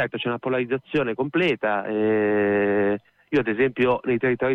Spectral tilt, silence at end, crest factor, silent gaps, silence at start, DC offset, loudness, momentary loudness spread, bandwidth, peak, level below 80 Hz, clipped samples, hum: -8 dB/octave; 0 s; 12 dB; none; 0 s; under 0.1%; -23 LUFS; 5 LU; 6 kHz; -10 dBFS; -58 dBFS; under 0.1%; none